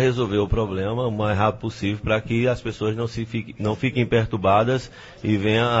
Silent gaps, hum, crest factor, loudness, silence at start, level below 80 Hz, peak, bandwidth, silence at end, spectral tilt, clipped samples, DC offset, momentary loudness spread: none; none; 18 dB; -23 LUFS; 0 s; -40 dBFS; -4 dBFS; 8 kHz; 0 s; -7 dB/octave; under 0.1%; under 0.1%; 8 LU